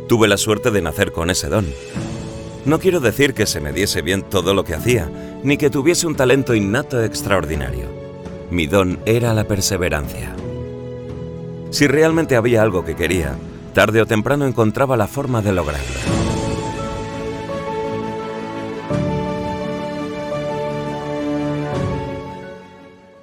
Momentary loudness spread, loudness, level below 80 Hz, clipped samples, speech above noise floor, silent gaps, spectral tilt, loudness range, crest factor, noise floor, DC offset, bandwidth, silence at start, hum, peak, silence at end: 13 LU; -19 LUFS; -36 dBFS; under 0.1%; 25 dB; none; -5 dB/octave; 7 LU; 18 dB; -42 dBFS; under 0.1%; 19.5 kHz; 0 s; none; 0 dBFS; 0.25 s